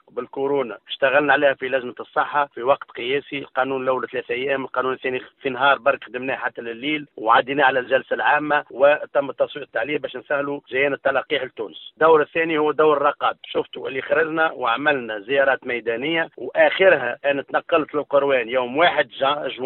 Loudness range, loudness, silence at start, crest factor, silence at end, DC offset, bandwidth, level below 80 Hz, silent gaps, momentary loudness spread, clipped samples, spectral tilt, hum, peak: 4 LU; -21 LUFS; 0.15 s; 18 dB; 0 s; under 0.1%; 4.2 kHz; -66 dBFS; none; 9 LU; under 0.1%; -8.5 dB/octave; none; -2 dBFS